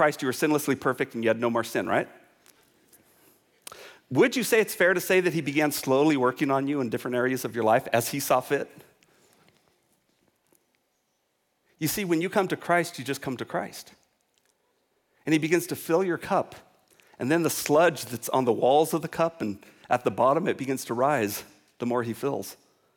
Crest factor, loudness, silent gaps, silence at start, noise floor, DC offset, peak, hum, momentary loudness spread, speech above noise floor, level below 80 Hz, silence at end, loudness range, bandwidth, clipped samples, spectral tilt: 16 dB; -26 LUFS; none; 0 s; -74 dBFS; under 0.1%; -10 dBFS; none; 13 LU; 49 dB; -70 dBFS; 0.4 s; 7 LU; 19 kHz; under 0.1%; -4.5 dB/octave